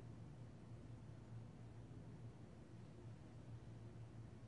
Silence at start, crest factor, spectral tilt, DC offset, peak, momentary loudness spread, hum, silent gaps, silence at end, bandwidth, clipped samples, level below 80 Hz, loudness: 0 s; 12 dB; -7.5 dB/octave; under 0.1%; -46 dBFS; 2 LU; none; none; 0 s; 10.5 kHz; under 0.1%; -70 dBFS; -58 LUFS